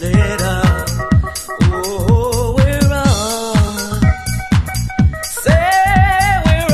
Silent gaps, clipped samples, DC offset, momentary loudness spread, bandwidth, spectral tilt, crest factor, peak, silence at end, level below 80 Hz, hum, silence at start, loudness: none; under 0.1%; under 0.1%; 6 LU; 14.5 kHz; -5.5 dB/octave; 14 dB; 0 dBFS; 0 s; -20 dBFS; none; 0 s; -14 LUFS